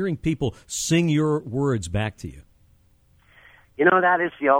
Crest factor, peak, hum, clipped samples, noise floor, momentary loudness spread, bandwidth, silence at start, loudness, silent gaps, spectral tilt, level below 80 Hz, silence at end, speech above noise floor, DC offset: 20 dB; -4 dBFS; none; under 0.1%; -59 dBFS; 12 LU; 16.5 kHz; 0 s; -22 LUFS; none; -5.5 dB/octave; -48 dBFS; 0 s; 37 dB; under 0.1%